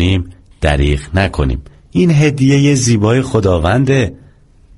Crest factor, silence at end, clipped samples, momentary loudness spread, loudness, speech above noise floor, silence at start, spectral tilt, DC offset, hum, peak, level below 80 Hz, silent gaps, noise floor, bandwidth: 12 dB; 0.65 s; under 0.1%; 8 LU; -13 LUFS; 32 dB; 0 s; -6 dB/octave; under 0.1%; none; 0 dBFS; -24 dBFS; none; -44 dBFS; 11.5 kHz